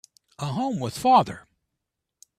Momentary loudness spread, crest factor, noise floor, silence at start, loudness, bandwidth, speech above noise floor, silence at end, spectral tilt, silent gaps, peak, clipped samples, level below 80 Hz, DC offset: 15 LU; 20 dB; -83 dBFS; 0.4 s; -23 LUFS; 14.5 kHz; 60 dB; 1 s; -5.5 dB/octave; none; -6 dBFS; under 0.1%; -62 dBFS; under 0.1%